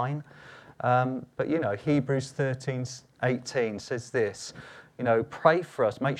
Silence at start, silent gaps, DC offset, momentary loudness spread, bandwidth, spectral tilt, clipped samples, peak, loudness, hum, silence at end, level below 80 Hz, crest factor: 0 s; none; under 0.1%; 15 LU; 11.5 kHz; -6.5 dB/octave; under 0.1%; -4 dBFS; -28 LUFS; none; 0 s; -66 dBFS; 24 dB